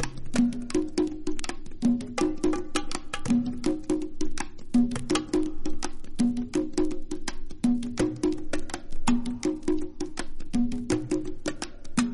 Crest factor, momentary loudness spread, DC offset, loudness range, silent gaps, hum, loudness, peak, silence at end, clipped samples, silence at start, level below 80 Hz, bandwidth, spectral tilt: 18 dB; 9 LU; under 0.1%; 1 LU; none; none; -29 LUFS; -8 dBFS; 0 s; under 0.1%; 0 s; -36 dBFS; 11.5 kHz; -5 dB/octave